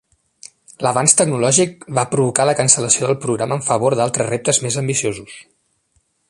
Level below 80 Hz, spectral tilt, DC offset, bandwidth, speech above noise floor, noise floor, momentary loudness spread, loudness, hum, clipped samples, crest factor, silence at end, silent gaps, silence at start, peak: -56 dBFS; -3.5 dB/octave; under 0.1%; 12 kHz; 47 dB; -64 dBFS; 8 LU; -16 LUFS; none; under 0.1%; 18 dB; 0.85 s; none; 0.8 s; 0 dBFS